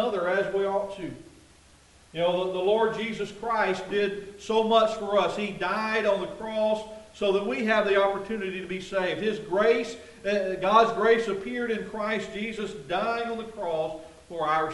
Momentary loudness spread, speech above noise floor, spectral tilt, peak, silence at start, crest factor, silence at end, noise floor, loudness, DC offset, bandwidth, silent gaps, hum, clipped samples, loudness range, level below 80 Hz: 11 LU; 29 dB; -5 dB/octave; -6 dBFS; 0 s; 20 dB; 0 s; -56 dBFS; -27 LUFS; under 0.1%; 11.5 kHz; none; none; under 0.1%; 4 LU; -60 dBFS